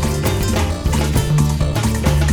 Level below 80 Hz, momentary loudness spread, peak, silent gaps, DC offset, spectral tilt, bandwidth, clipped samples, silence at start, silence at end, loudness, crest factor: -22 dBFS; 2 LU; -4 dBFS; none; under 0.1%; -5.5 dB/octave; over 20 kHz; under 0.1%; 0 s; 0 s; -18 LUFS; 12 dB